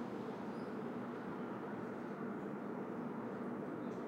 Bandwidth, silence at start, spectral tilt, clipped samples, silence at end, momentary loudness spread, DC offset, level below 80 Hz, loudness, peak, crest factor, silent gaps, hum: 16 kHz; 0 s; -8 dB/octave; under 0.1%; 0 s; 1 LU; under 0.1%; -82 dBFS; -45 LUFS; -32 dBFS; 12 dB; none; none